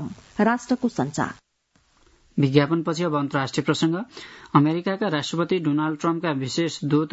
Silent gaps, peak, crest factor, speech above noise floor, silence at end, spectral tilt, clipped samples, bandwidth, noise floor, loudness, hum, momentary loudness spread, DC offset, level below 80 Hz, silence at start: none; 0 dBFS; 22 dB; 42 dB; 0.05 s; -6 dB/octave; under 0.1%; 8 kHz; -65 dBFS; -23 LUFS; none; 9 LU; under 0.1%; -62 dBFS; 0 s